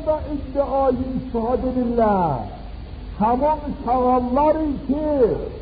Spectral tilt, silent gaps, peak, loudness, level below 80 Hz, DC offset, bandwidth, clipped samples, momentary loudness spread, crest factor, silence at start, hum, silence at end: -7.5 dB/octave; none; -8 dBFS; -21 LUFS; -34 dBFS; under 0.1%; 5 kHz; under 0.1%; 10 LU; 14 dB; 0 s; none; 0 s